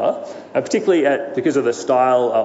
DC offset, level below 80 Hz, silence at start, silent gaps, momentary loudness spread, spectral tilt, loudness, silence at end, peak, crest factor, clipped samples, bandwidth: under 0.1%; -72 dBFS; 0 s; none; 8 LU; -5 dB/octave; -18 LUFS; 0 s; -4 dBFS; 14 dB; under 0.1%; 8 kHz